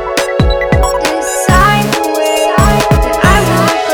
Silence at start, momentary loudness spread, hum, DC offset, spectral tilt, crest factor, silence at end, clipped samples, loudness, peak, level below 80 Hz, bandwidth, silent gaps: 0 s; 5 LU; none; under 0.1%; -4.5 dB/octave; 10 dB; 0 s; 1%; -10 LUFS; 0 dBFS; -18 dBFS; over 20 kHz; none